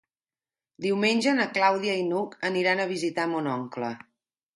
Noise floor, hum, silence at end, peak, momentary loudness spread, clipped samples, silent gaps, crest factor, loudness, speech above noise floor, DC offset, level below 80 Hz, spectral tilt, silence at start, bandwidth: under -90 dBFS; none; 0.6 s; -8 dBFS; 10 LU; under 0.1%; none; 20 dB; -26 LUFS; over 64 dB; under 0.1%; -74 dBFS; -4.5 dB/octave; 0.8 s; 11.5 kHz